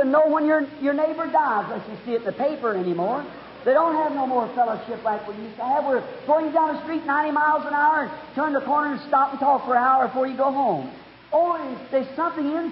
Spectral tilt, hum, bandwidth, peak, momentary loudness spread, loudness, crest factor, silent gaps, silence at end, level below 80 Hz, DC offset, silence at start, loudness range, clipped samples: -10 dB/octave; none; 5.8 kHz; -8 dBFS; 8 LU; -23 LUFS; 14 dB; none; 0 s; -66 dBFS; under 0.1%; 0 s; 3 LU; under 0.1%